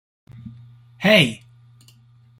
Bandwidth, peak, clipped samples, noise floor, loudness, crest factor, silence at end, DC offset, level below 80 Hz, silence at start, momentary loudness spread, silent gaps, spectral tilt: 16.5 kHz; -2 dBFS; under 0.1%; -52 dBFS; -17 LUFS; 22 dB; 1.05 s; under 0.1%; -60 dBFS; 0.45 s; 27 LU; none; -5 dB/octave